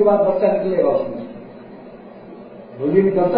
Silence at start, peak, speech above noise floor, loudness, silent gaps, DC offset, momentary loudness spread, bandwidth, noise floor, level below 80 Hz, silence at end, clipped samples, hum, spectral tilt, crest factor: 0 s; -2 dBFS; 22 dB; -18 LUFS; none; under 0.1%; 23 LU; 5 kHz; -38 dBFS; -58 dBFS; 0 s; under 0.1%; none; -12.5 dB/octave; 18 dB